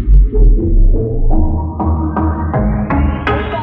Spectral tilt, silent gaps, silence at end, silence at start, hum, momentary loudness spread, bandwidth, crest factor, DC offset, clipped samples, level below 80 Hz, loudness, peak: -10.5 dB/octave; none; 0 s; 0 s; none; 4 LU; 3.8 kHz; 10 dB; under 0.1%; under 0.1%; -12 dBFS; -15 LUFS; 0 dBFS